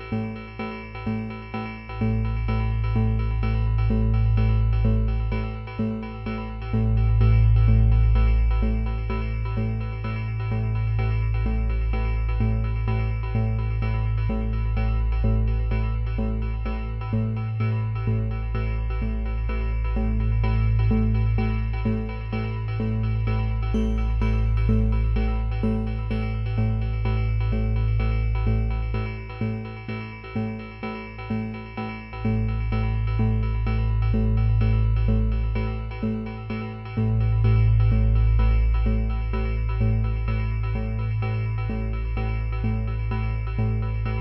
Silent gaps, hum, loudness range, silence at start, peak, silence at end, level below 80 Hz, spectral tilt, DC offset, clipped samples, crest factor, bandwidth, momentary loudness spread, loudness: none; none; 5 LU; 0 s; -8 dBFS; 0 s; -26 dBFS; -10 dB/octave; under 0.1%; under 0.1%; 14 dB; 5.6 kHz; 9 LU; -25 LUFS